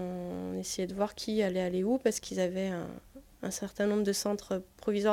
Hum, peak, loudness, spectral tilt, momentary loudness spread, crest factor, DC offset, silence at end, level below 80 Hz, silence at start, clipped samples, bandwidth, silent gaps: none; -14 dBFS; -33 LUFS; -5 dB/octave; 9 LU; 18 dB; under 0.1%; 0 s; -60 dBFS; 0 s; under 0.1%; 17 kHz; none